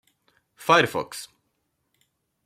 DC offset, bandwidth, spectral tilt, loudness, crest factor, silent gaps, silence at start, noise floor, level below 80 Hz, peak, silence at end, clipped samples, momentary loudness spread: under 0.1%; 16.5 kHz; -3.5 dB/octave; -22 LUFS; 24 dB; none; 0.6 s; -75 dBFS; -70 dBFS; -4 dBFS; 1.2 s; under 0.1%; 20 LU